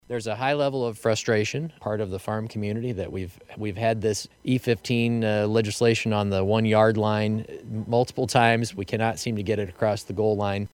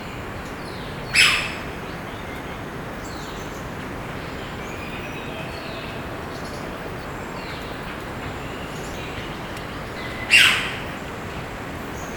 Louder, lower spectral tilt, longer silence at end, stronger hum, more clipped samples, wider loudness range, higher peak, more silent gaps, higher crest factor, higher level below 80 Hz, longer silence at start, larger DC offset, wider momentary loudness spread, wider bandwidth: about the same, -25 LUFS vs -24 LUFS; first, -5.5 dB/octave vs -3 dB/octave; about the same, 0.05 s vs 0 s; neither; neither; second, 5 LU vs 10 LU; second, -4 dBFS vs 0 dBFS; neither; about the same, 22 dB vs 26 dB; second, -58 dBFS vs -42 dBFS; about the same, 0.1 s vs 0 s; neither; second, 10 LU vs 16 LU; second, 16.5 kHz vs 19 kHz